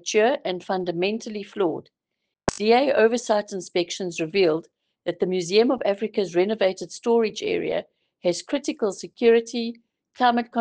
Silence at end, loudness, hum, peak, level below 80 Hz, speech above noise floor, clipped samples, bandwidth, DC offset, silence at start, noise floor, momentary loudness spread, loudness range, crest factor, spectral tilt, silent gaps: 0 s; -24 LUFS; none; -4 dBFS; -60 dBFS; 59 dB; under 0.1%; 9.8 kHz; under 0.1%; 0.05 s; -81 dBFS; 10 LU; 2 LU; 20 dB; -4 dB/octave; none